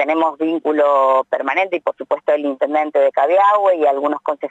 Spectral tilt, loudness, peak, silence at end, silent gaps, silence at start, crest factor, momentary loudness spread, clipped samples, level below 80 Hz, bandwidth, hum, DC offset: -5 dB/octave; -16 LUFS; -4 dBFS; 0 s; none; 0 s; 12 dB; 7 LU; under 0.1%; -80 dBFS; 7.8 kHz; none; under 0.1%